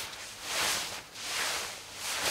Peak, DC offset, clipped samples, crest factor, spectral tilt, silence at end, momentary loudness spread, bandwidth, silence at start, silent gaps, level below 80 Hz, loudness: -16 dBFS; under 0.1%; under 0.1%; 18 dB; 0.5 dB/octave; 0 s; 10 LU; 16 kHz; 0 s; none; -64 dBFS; -33 LUFS